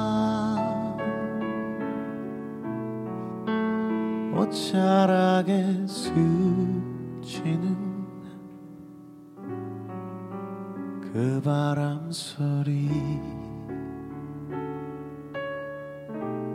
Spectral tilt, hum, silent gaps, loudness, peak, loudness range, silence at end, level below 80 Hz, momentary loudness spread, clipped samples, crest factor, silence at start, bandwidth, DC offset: -7 dB/octave; none; none; -28 LUFS; -8 dBFS; 11 LU; 0 s; -58 dBFS; 15 LU; under 0.1%; 20 dB; 0 s; 13 kHz; under 0.1%